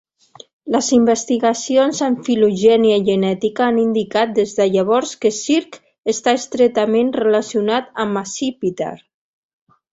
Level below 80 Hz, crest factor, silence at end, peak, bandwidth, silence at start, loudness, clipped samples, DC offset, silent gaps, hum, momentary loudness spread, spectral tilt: -60 dBFS; 16 dB; 0.95 s; -2 dBFS; 8 kHz; 0.65 s; -17 LUFS; under 0.1%; under 0.1%; none; none; 8 LU; -4.5 dB/octave